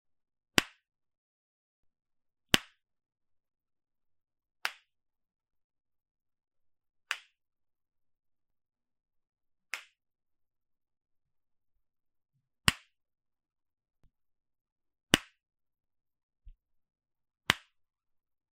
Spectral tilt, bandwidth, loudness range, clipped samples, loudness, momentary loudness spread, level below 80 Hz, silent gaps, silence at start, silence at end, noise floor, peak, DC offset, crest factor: -2 dB/octave; 11 kHz; 17 LU; under 0.1%; -32 LUFS; 14 LU; -60 dBFS; 1.18-1.83 s, 5.64-5.70 s, 14.72-14.76 s, 16.23-16.29 s; 0.6 s; 0.95 s; under -90 dBFS; -6 dBFS; under 0.1%; 36 dB